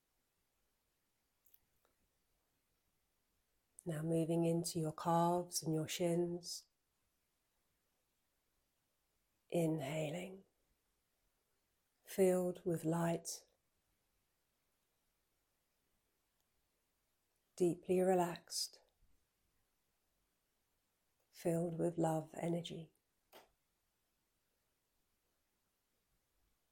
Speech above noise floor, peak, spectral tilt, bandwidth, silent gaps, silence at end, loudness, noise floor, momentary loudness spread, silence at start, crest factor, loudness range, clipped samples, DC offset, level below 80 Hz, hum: 47 dB; -24 dBFS; -5.5 dB/octave; 17 kHz; none; 3.35 s; -39 LUFS; -85 dBFS; 13 LU; 3.85 s; 20 dB; 10 LU; under 0.1%; under 0.1%; -80 dBFS; none